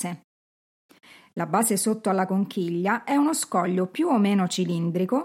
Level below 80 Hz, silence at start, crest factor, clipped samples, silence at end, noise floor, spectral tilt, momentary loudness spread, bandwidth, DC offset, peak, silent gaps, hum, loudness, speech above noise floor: -78 dBFS; 0 s; 16 dB; under 0.1%; 0 s; under -90 dBFS; -5 dB/octave; 5 LU; 16.5 kHz; under 0.1%; -8 dBFS; 0.24-0.89 s; none; -24 LUFS; over 67 dB